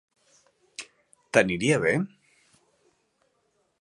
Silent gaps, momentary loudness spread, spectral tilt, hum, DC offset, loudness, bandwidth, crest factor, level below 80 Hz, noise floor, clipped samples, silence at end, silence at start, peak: none; 20 LU; -5 dB/octave; none; under 0.1%; -24 LUFS; 11.5 kHz; 26 dB; -62 dBFS; -72 dBFS; under 0.1%; 1.75 s; 0.8 s; -2 dBFS